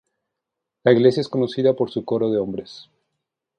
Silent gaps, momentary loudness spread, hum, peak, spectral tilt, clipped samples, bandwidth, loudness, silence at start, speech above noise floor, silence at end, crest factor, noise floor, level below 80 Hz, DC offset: none; 13 LU; none; -2 dBFS; -7.5 dB/octave; under 0.1%; 9.6 kHz; -20 LUFS; 0.85 s; 63 dB; 0.75 s; 20 dB; -83 dBFS; -62 dBFS; under 0.1%